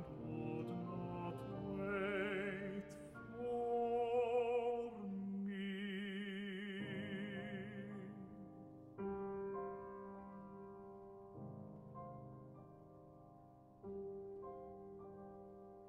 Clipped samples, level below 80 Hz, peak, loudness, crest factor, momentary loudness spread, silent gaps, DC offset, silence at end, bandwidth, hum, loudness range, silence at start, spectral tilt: under 0.1%; -72 dBFS; -28 dBFS; -45 LUFS; 18 dB; 18 LU; none; under 0.1%; 0 s; 11 kHz; none; 14 LU; 0 s; -7.5 dB/octave